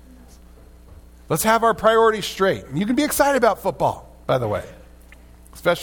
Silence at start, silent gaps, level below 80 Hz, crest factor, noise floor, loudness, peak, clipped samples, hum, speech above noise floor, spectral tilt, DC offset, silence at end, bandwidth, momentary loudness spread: 0.9 s; none; -46 dBFS; 18 dB; -45 dBFS; -20 LUFS; -2 dBFS; under 0.1%; none; 26 dB; -4.5 dB/octave; under 0.1%; 0 s; 18 kHz; 10 LU